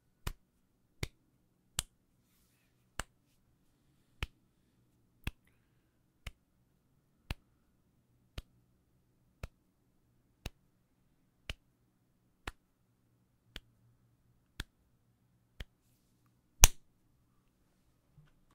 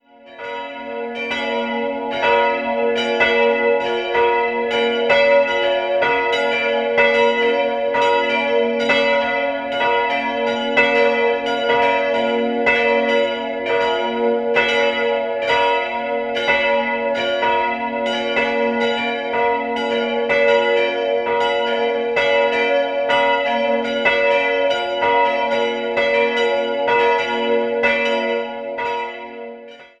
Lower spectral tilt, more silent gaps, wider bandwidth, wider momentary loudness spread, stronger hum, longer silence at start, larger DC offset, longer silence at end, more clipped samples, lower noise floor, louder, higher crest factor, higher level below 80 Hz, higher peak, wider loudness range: second, -1 dB/octave vs -3.5 dB/octave; neither; first, 16 kHz vs 8.4 kHz; first, 23 LU vs 7 LU; neither; about the same, 0.25 s vs 0.25 s; neither; first, 1.75 s vs 0.15 s; neither; first, -74 dBFS vs -38 dBFS; second, -33 LUFS vs -17 LUFS; first, 42 dB vs 16 dB; first, -44 dBFS vs -54 dBFS; about the same, 0 dBFS vs 0 dBFS; first, 22 LU vs 2 LU